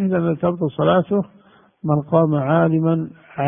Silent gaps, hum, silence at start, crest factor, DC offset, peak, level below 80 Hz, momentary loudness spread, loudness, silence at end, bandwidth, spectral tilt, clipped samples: none; none; 0 s; 18 dB; under 0.1%; -2 dBFS; -54 dBFS; 8 LU; -19 LUFS; 0 s; 3.7 kHz; -13 dB/octave; under 0.1%